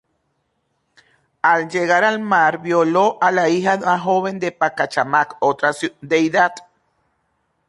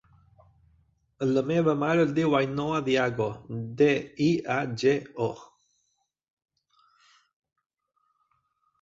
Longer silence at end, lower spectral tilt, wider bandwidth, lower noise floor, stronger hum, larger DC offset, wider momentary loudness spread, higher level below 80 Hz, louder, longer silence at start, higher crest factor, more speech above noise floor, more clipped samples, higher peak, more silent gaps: second, 1.1 s vs 3.35 s; second, -5 dB/octave vs -6.5 dB/octave; first, 11.5 kHz vs 7.8 kHz; second, -69 dBFS vs -76 dBFS; neither; neither; second, 5 LU vs 9 LU; about the same, -66 dBFS vs -64 dBFS; first, -17 LUFS vs -26 LUFS; first, 1.45 s vs 1.2 s; about the same, 16 dB vs 18 dB; about the same, 52 dB vs 50 dB; neither; first, -2 dBFS vs -10 dBFS; neither